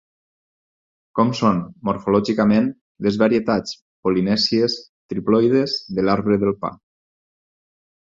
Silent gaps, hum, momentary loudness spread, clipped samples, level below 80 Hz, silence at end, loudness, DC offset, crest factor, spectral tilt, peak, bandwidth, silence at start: 2.81-2.95 s, 3.82-4.03 s, 4.89-5.09 s; none; 9 LU; under 0.1%; -54 dBFS; 1.35 s; -20 LUFS; under 0.1%; 18 dB; -6.5 dB/octave; -2 dBFS; 7.6 kHz; 1.15 s